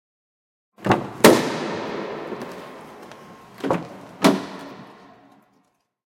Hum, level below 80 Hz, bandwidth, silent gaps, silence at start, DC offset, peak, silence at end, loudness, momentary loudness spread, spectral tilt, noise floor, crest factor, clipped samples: none; -60 dBFS; 16.5 kHz; none; 0.8 s; under 0.1%; 0 dBFS; 1.15 s; -21 LUFS; 26 LU; -4.5 dB/octave; -66 dBFS; 24 dB; under 0.1%